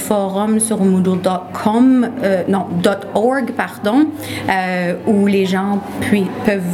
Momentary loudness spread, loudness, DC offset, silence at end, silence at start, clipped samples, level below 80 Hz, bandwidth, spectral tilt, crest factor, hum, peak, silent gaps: 6 LU; -16 LUFS; under 0.1%; 0 s; 0 s; under 0.1%; -54 dBFS; 15.5 kHz; -5.5 dB/octave; 16 dB; none; 0 dBFS; none